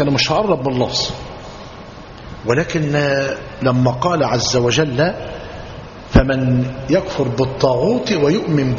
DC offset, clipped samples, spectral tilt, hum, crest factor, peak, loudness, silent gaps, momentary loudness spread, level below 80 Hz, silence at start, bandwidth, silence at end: under 0.1%; under 0.1%; -5 dB/octave; none; 18 dB; 0 dBFS; -17 LUFS; none; 18 LU; -32 dBFS; 0 s; 7.4 kHz; 0 s